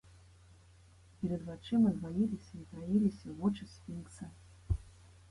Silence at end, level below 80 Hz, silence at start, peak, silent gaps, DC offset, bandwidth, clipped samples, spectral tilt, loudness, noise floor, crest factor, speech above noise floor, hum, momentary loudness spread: 0.4 s; -52 dBFS; 1.2 s; -20 dBFS; none; under 0.1%; 11.5 kHz; under 0.1%; -8 dB/octave; -36 LUFS; -61 dBFS; 16 dB; 26 dB; none; 17 LU